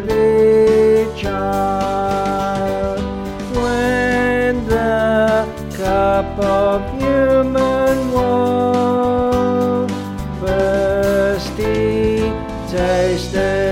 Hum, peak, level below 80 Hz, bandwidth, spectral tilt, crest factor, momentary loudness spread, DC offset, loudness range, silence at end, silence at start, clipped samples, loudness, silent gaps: none; -2 dBFS; -32 dBFS; 16.5 kHz; -6.5 dB/octave; 14 dB; 8 LU; under 0.1%; 2 LU; 0 s; 0 s; under 0.1%; -16 LUFS; none